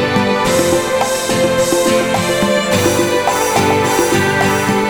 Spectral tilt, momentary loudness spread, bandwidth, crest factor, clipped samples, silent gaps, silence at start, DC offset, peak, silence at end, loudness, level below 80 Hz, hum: -4 dB/octave; 2 LU; over 20 kHz; 12 dB; under 0.1%; none; 0 s; under 0.1%; 0 dBFS; 0 s; -13 LUFS; -40 dBFS; none